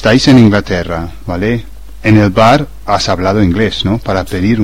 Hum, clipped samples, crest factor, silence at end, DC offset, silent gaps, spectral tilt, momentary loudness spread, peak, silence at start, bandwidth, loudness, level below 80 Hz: none; 0.3%; 10 dB; 0 s; 4%; none; -6 dB/octave; 11 LU; 0 dBFS; 0 s; 15.5 kHz; -11 LUFS; -30 dBFS